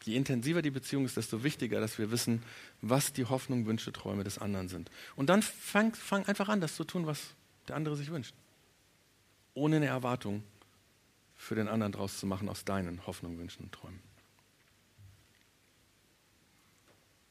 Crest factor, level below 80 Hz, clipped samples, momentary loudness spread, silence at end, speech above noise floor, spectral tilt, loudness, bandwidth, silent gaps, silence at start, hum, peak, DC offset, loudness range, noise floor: 24 dB; -68 dBFS; under 0.1%; 16 LU; 2.2 s; 34 dB; -5 dB/octave; -34 LUFS; 15.5 kHz; none; 0 s; none; -12 dBFS; under 0.1%; 9 LU; -68 dBFS